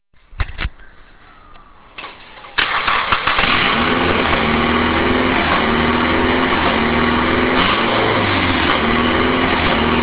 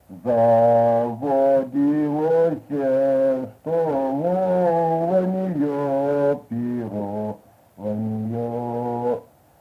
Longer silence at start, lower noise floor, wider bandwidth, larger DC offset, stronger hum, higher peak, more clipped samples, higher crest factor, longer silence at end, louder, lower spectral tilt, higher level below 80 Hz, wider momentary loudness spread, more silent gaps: first, 0.3 s vs 0.1 s; about the same, -42 dBFS vs -45 dBFS; second, 4 kHz vs 6.2 kHz; neither; neither; first, 0 dBFS vs -8 dBFS; neither; about the same, 16 dB vs 12 dB; second, 0 s vs 0.4 s; first, -15 LUFS vs -21 LUFS; about the same, -8.5 dB/octave vs -9.5 dB/octave; first, -30 dBFS vs -62 dBFS; about the same, 11 LU vs 10 LU; neither